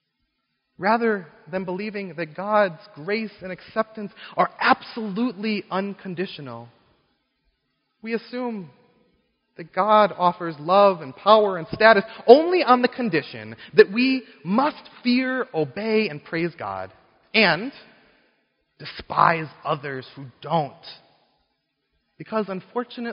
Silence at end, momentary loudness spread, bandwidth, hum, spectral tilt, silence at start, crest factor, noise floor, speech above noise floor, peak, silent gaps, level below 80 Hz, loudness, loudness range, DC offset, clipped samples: 0 s; 19 LU; 5.6 kHz; none; -3 dB/octave; 0.8 s; 24 dB; -75 dBFS; 53 dB; 0 dBFS; none; -64 dBFS; -22 LUFS; 13 LU; under 0.1%; under 0.1%